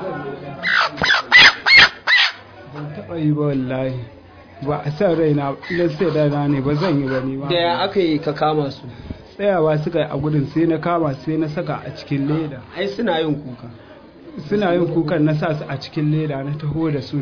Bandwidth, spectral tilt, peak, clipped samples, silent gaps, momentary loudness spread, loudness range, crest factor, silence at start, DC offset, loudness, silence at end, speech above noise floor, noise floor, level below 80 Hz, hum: 5.4 kHz; -5.5 dB/octave; 0 dBFS; under 0.1%; none; 18 LU; 9 LU; 18 dB; 0 s; under 0.1%; -17 LUFS; 0 s; 20 dB; -40 dBFS; -48 dBFS; none